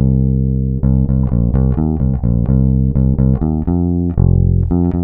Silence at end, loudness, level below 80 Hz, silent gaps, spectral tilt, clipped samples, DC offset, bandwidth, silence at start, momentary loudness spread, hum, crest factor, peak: 0 s; -15 LUFS; -18 dBFS; none; -15 dB/octave; under 0.1%; under 0.1%; 1.9 kHz; 0 s; 3 LU; none; 12 dB; 0 dBFS